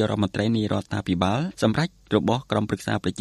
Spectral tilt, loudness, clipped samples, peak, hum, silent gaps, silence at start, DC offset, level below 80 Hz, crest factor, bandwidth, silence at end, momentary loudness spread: -6.5 dB/octave; -24 LUFS; under 0.1%; -6 dBFS; none; none; 0 s; under 0.1%; -52 dBFS; 18 dB; 12.5 kHz; 0 s; 4 LU